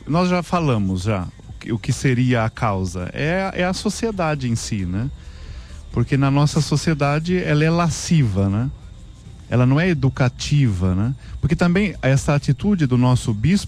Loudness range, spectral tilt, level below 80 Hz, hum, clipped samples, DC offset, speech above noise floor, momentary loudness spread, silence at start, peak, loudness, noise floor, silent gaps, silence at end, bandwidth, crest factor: 3 LU; -6.5 dB/octave; -38 dBFS; none; under 0.1%; under 0.1%; 20 dB; 9 LU; 0 s; -6 dBFS; -20 LUFS; -39 dBFS; none; 0 s; 13 kHz; 12 dB